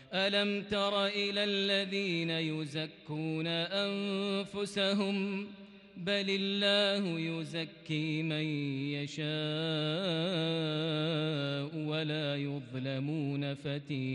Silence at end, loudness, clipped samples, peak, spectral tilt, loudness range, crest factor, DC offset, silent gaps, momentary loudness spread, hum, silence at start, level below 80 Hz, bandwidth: 0 s; -33 LUFS; under 0.1%; -20 dBFS; -5.5 dB/octave; 2 LU; 14 dB; under 0.1%; none; 8 LU; none; 0 s; -74 dBFS; 10.5 kHz